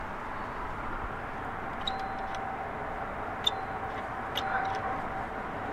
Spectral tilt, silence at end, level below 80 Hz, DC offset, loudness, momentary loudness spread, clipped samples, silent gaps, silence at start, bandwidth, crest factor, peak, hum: -4 dB/octave; 0 s; -48 dBFS; under 0.1%; -34 LUFS; 7 LU; under 0.1%; none; 0 s; 15.5 kHz; 24 dB; -12 dBFS; none